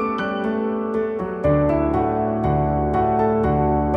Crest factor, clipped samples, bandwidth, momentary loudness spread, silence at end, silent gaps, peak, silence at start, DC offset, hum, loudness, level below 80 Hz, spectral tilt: 12 dB; under 0.1%; 5.8 kHz; 4 LU; 0 s; none; -6 dBFS; 0 s; under 0.1%; none; -21 LUFS; -34 dBFS; -10 dB/octave